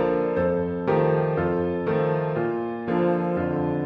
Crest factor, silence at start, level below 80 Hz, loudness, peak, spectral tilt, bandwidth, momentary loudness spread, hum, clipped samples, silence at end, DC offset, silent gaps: 14 dB; 0 s; -48 dBFS; -24 LUFS; -10 dBFS; -10.5 dB/octave; 5.4 kHz; 4 LU; none; under 0.1%; 0 s; under 0.1%; none